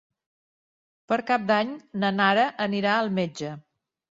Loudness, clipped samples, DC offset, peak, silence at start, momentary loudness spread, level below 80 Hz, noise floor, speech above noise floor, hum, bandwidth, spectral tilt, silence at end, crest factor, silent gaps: -24 LUFS; under 0.1%; under 0.1%; -6 dBFS; 1.1 s; 11 LU; -70 dBFS; under -90 dBFS; over 66 dB; none; 7.8 kHz; -5.5 dB/octave; 0.55 s; 20 dB; none